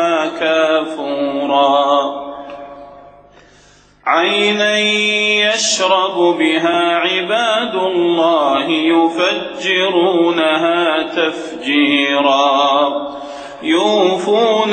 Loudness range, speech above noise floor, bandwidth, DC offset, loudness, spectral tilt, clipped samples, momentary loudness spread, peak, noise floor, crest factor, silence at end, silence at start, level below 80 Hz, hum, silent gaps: 4 LU; 33 dB; 9 kHz; under 0.1%; -14 LUFS; -3 dB/octave; under 0.1%; 10 LU; 0 dBFS; -47 dBFS; 14 dB; 0 s; 0 s; -60 dBFS; none; none